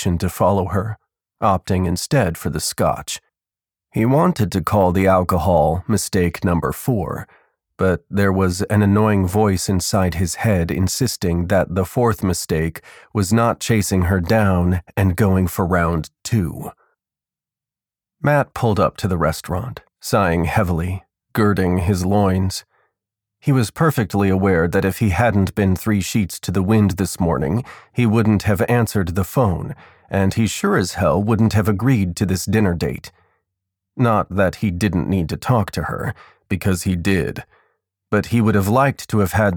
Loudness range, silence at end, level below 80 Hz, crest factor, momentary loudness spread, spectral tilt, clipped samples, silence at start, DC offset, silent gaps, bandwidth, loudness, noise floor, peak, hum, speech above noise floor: 3 LU; 0 s; -38 dBFS; 16 dB; 9 LU; -6 dB/octave; under 0.1%; 0 s; under 0.1%; none; 20 kHz; -19 LUFS; under -90 dBFS; -4 dBFS; none; over 72 dB